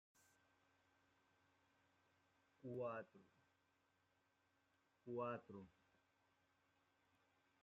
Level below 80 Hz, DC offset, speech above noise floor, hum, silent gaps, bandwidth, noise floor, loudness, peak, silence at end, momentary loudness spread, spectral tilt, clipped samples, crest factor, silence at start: under -90 dBFS; under 0.1%; 33 dB; none; none; 7 kHz; -84 dBFS; -52 LUFS; -36 dBFS; 1.9 s; 17 LU; -6.5 dB/octave; under 0.1%; 24 dB; 2.65 s